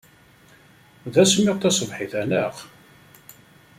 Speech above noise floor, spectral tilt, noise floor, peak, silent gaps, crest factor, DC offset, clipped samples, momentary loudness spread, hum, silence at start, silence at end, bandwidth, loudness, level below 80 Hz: 32 dB; -4 dB/octave; -53 dBFS; -4 dBFS; none; 20 dB; under 0.1%; under 0.1%; 15 LU; none; 1.05 s; 1.1 s; 16 kHz; -21 LUFS; -62 dBFS